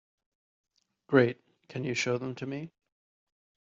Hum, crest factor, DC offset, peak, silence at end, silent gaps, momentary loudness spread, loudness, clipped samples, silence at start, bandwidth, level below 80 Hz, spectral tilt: none; 24 dB; under 0.1%; -10 dBFS; 1.05 s; none; 18 LU; -30 LUFS; under 0.1%; 1.1 s; 7.6 kHz; -74 dBFS; -5 dB/octave